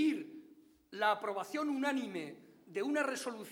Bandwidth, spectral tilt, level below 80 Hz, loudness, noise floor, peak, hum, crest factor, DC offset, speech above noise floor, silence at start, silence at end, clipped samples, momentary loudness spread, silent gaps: 17.5 kHz; -3.5 dB/octave; -86 dBFS; -37 LUFS; -62 dBFS; -20 dBFS; none; 18 dB; under 0.1%; 26 dB; 0 s; 0 s; under 0.1%; 17 LU; none